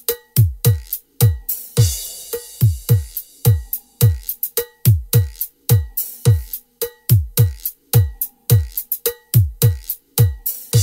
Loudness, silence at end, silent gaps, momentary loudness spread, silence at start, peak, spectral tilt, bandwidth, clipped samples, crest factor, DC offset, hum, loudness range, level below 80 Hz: -18 LUFS; 0 s; none; 9 LU; 0.1 s; 0 dBFS; -5.5 dB/octave; 16.5 kHz; under 0.1%; 18 dB; under 0.1%; none; 1 LU; -32 dBFS